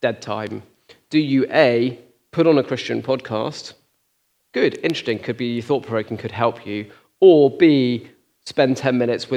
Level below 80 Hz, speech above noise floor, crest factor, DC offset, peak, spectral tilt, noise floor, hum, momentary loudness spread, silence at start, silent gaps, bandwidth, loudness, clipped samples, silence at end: -70 dBFS; 49 dB; 20 dB; under 0.1%; 0 dBFS; -6.5 dB/octave; -67 dBFS; none; 15 LU; 0 s; none; 10.5 kHz; -19 LUFS; under 0.1%; 0 s